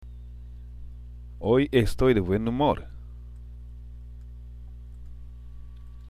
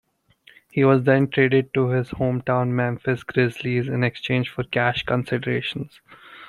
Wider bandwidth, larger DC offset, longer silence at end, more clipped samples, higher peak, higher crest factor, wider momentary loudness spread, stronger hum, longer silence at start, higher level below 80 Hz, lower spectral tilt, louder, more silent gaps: first, 15 kHz vs 11 kHz; neither; about the same, 0 s vs 0 s; neither; second, -8 dBFS vs -4 dBFS; about the same, 20 dB vs 18 dB; first, 23 LU vs 7 LU; first, 60 Hz at -40 dBFS vs none; second, 0 s vs 0.75 s; first, -40 dBFS vs -54 dBFS; about the same, -7.5 dB/octave vs -8 dB/octave; about the same, -24 LUFS vs -22 LUFS; neither